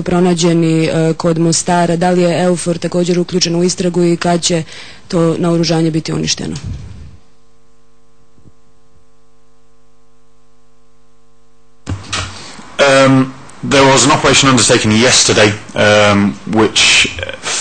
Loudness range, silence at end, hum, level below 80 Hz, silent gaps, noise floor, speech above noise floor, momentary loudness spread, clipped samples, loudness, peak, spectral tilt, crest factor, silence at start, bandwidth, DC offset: 15 LU; 0 s; 50 Hz at -50 dBFS; -40 dBFS; none; -53 dBFS; 42 dB; 15 LU; under 0.1%; -11 LUFS; 0 dBFS; -4 dB/octave; 14 dB; 0 s; 9.4 kHz; 2%